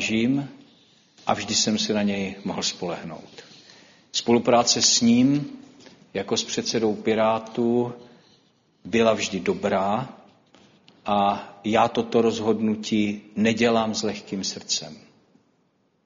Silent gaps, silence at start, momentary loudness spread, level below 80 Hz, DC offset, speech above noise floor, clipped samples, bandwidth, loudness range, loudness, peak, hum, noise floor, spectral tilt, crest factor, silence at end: none; 0 s; 13 LU; -62 dBFS; under 0.1%; 44 dB; under 0.1%; 7.6 kHz; 5 LU; -23 LUFS; -4 dBFS; none; -67 dBFS; -3.5 dB/octave; 20 dB; 1.05 s